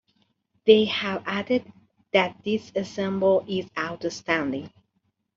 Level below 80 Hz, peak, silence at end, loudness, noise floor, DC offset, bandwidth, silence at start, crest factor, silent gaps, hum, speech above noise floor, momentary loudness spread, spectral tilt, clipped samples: -66 dBFS; -4 dBFS; 0.7 s; -25 LUFS; -74 dBFS; under 0.1%; 7.6 kHz; 0.65 s; 22 dB; none; none; 50 dB; 12 LU; -5.5 dB/octave; under 0.1%